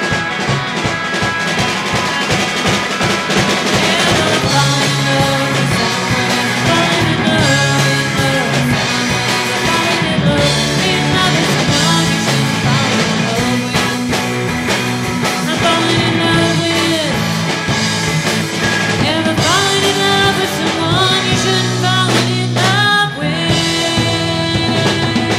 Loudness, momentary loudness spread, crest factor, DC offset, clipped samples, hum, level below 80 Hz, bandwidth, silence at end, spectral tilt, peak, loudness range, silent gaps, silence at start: -13 LUFS; 4 LU; 12 dB; under 0.1%; under 0.1%; none; -38 dBFS; 16.5 kHz; 0 s; -4 dB/octave; -2 dBFS; 2 LU; none; 0 s